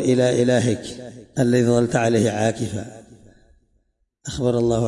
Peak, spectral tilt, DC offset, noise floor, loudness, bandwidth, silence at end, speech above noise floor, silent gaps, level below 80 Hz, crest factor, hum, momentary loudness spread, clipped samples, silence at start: -6 dBFS; -6 dB/octave; under 0.1%; -67 dBFS; -20 LUFS; 11.5 kHz; 0 s; 48 dB; none; -50 dBFS; 14 dB; none; 16 LU; under 0.1%; 0 s